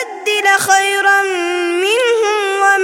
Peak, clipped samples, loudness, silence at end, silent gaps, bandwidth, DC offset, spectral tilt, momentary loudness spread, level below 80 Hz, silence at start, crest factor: 0 dBFS; under 0.1%; -13 LUFS; 0 s; none; 17 kHz; under 0.1%; -1 dB/octave; 6 LU; -66 dBFS; 0 s; 14 dB